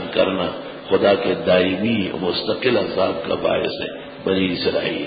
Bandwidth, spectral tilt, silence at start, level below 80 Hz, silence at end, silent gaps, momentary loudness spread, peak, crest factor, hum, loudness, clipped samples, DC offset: 5 kHz; -10.5 dB/octave; 0 s; -48 dBFS; 0 s; none; 8 LU; -4 dBFS; 16 dB; none; -20 LUFS; under 0.1%; under 0.1%